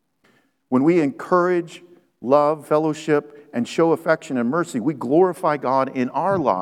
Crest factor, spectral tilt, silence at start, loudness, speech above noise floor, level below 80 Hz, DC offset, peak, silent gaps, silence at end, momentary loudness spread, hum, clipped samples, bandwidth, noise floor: 18 dB; -7 dB/octave; 0.7 s; -20 LUFS; 42 dB; -70 dBFS; under 0.1%; -2 dBFS; none; 0 s; 7 LU; none; under 0.1%; 13.5 kHz; -61 dBFS